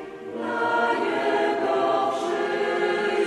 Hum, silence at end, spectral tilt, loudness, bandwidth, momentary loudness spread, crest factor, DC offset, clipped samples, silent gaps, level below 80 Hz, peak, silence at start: none; 0 s; -4 dB/octave; -24 LUFS; 12 kHz; 4 LU; 14 dB; under 0.1%; under 0.1%; none; -68 dBFS; -10 dBFS; 0 s